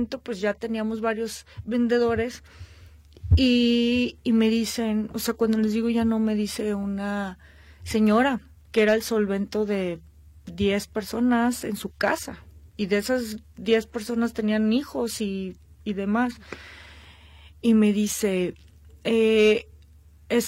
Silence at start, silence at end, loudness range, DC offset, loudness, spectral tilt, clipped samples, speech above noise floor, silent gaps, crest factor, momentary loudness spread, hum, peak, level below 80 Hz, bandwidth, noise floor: 0 s; 0 s; 4 LU; under 0.1%; -24 LUFS; -5.5 dB/octave; under 0.1%; 28 dB; none; 16 dB; 13 LU; none; -10 dBFS; -42 dBFS; 16 kHz; -52 dBFS